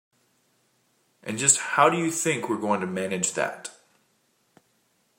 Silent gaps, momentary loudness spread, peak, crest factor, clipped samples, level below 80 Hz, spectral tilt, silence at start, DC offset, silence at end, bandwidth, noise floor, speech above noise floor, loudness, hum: none; 17 LU; -4 dBFS; 24 dB; under 0.1%; -76 dBFS; -3 dB/octave; 1.25 s; under 0.1%; 1.5 s; 16 kHz; -68 dBFS; 44 dB; -24 LUFS; none